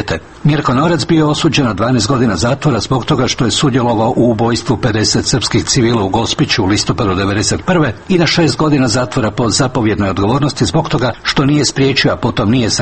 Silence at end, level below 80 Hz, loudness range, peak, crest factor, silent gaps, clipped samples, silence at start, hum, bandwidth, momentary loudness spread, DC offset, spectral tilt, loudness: 0 s; -34 dBFS; 0 LU; 0 dBFS; 12 dB; none; under 0.1%; 0 s; none; 8.8 kHz; 3 LU; under 0.1%; -5 dB/octave; -13 LUFS